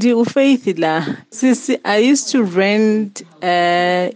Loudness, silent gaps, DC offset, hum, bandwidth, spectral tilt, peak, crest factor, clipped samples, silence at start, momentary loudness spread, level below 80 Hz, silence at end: -15 LUFS; none; under 0.1%; none; 9.8 kHz; -4.5 dB/octave; -2 dBFS; 12 dB; under 0.1%; 0 s; 7 LU; -74 dBFS; 0 s